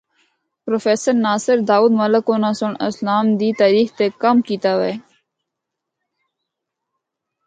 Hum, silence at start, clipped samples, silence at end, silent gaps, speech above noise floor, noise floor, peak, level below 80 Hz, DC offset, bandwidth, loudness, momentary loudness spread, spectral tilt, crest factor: none; 0.65 s; under 0.1%; 2.45 s; none; 64 dB; -80 dBFS; -2 dBFS; -68 dBFS; under 0.1%; 9.2 kHz; -17 LUFS; 8 LU; -5.5 dB/octave; 16 dB